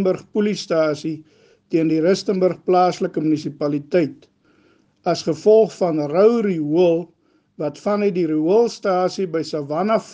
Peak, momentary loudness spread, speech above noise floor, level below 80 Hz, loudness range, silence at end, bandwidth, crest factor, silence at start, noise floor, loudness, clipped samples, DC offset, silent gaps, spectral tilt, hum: -4 dBFS; 9 LU; 39 dB; -66 dBFS; 2 LU; 0 s; 9.2 kHz; 16 dB; 0 s; -58 dBFS; -19 LUFS; under 0.1%; under 0.1%; none; -6.5 dB/octave; none